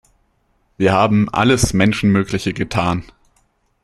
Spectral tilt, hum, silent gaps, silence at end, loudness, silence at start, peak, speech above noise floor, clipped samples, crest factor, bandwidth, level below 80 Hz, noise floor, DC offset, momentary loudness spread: -5.5 dB/octave; none; none; 0.8 s; -16 LUFS; 0.8 s; 0 dBFS; 47 dB; under 0.1%; 16 dB; 13.5 kHz; -38 dBFS; -62 dBFS; under 0.1%; 7 LU